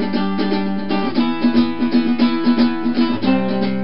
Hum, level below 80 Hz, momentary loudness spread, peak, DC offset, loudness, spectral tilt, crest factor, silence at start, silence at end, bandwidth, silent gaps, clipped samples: none; -56 dBFS; 4 LU; -2 dBFS; 5%; -18 LUFS; -9.5 dB/octave; 14 dB; 0 s; 0 s; 5.8 kHz; none; under 0.1%